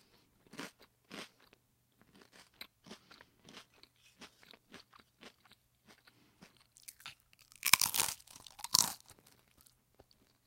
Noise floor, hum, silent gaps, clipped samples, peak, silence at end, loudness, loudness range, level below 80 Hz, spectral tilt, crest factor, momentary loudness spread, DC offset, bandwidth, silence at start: -72 dBFS; none; none; under 0.1%; -2 dBFS; 1.5 s; -31 LUFS; 24 LU; -76 dBFS; 1 dB/octave; 40 dB; 29 LU; under 0.1%; 17 kHz; 0.55 s